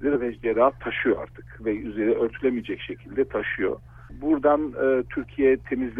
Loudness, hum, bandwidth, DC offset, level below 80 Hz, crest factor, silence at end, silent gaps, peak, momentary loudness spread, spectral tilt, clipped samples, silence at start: -25 LUFS; none; 3.7 kHz; under 0.1%; -48 dBFS; 16 dB; 0 s; none; -8 dBFS; 10 LU; -8.5 dB/octave; under 0.1%; 0 s